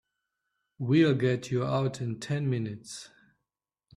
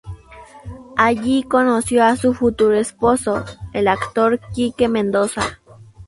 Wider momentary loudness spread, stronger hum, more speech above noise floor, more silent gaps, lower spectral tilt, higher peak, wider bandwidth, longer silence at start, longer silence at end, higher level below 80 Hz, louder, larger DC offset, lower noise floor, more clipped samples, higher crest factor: first, 16 LU vs 11 LU; neither; first, 60 dB vs 25 dB; neither; first, -7 dB/octave vs -5 dB/octave; second, -12 dBFS vs 0 dBFS; about the same, 11.5 kHz vs 11.5 kHz; first, 0.8 s vs 0.05 s; first, 0.9 s vs 0.05 s; second, -66 dBFS vs -44 dBFS; second, -28 LUFS vs -18 LUFS; neither; first, -88 dBFS vs -42 dBFS; neither; about the same, 18 dB vs 18 dB